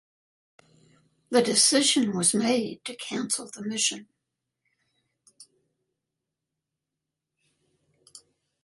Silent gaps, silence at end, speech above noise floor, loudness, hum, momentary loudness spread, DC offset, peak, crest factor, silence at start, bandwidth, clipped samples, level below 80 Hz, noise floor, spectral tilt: none; 0.45 s; 61 dB; -24 LUFS; none; 14 LU; under 0.1%; -8 dBFS; 22 dB; 1.3 s; 12 kHz; under 0.1%; -74 dBFS; -86 dBFS; -2 dB/octave